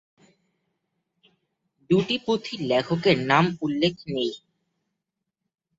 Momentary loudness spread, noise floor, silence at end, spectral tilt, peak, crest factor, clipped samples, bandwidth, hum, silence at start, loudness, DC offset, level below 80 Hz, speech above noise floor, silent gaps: 8 LU; -83 dBFS; 1.4 s; -6 dB/octave; -4 dBFS; 24 dB; under 0.1%; 7.8 kHz; none; 1.9 s; -24 LUFS; under 0.1%; -62 dBFS; 60 dB; none